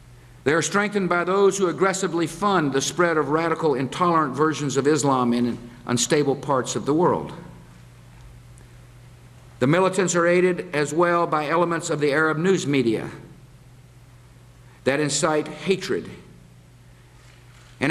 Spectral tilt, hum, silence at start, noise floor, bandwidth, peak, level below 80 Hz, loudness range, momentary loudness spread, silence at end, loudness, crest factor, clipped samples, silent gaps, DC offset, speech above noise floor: -4.5 dB/octave; none; 0.1 s; -49 dBFS; 13.5 kHz; -4 dBFS; -56 dBFS; 6 LU; 7 LU; 0 s; -22 LUFS; 18 dB; under 0.1%; none; under 0.1%; 28 dB